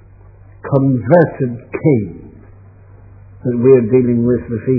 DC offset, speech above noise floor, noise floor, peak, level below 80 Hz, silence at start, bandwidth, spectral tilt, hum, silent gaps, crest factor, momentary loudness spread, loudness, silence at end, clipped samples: under 0.1%; 28 dB; -41 dBFS; 0 dBFS; -44 dBFS; 0.65 s; 2.7 kHz; -13.5 dB/octave; none; none; 16 dB; 11 LU; -14 LUFS; 0 s; under 0.1%